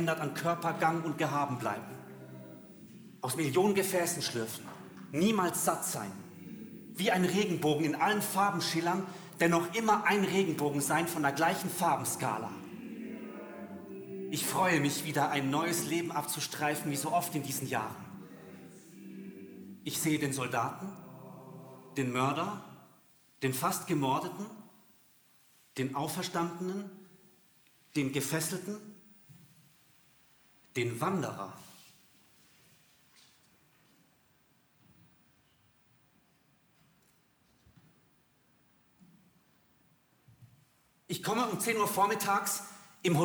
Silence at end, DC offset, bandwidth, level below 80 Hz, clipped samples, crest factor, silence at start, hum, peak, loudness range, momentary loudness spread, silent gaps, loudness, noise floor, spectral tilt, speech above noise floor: 0 s; under 0.1%; over 20 kHz; -80 dBFS; under 0.1%; 20 dB; 0 s; none; -14 dBFS; 10 LU; 20 LU; none; -32 LUFS; -69 dBFS; -4 dB/octave; 37 dB